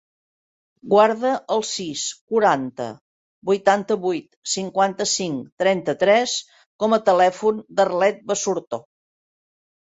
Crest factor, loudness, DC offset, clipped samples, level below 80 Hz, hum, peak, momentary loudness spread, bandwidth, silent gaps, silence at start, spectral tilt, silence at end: 20 dB; -21 LUFS; under 0.1%; under 0.1%; -68 dBFS; none; -2 dBFS; 10 LU; 8.4 kHz; 2.21-2.27 s, 3.01-3.42 s, 4.36-4.42 s, 5.52-5.57 s, 6.66-6.79 s; 0.85 s; -3.5 dB/octave; 1.15 s